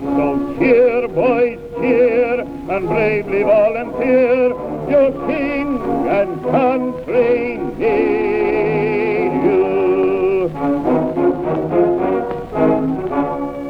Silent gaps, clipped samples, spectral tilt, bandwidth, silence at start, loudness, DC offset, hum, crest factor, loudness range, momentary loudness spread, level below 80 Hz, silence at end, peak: none; under 0.1%; -8.5 dB/octave; 5.6 kHz; 0 s; -16 LUFS; under 0.1%; none; 14 dB; 1 LU; 6 LU; -42 dBFS; 0 s; -2 dBFS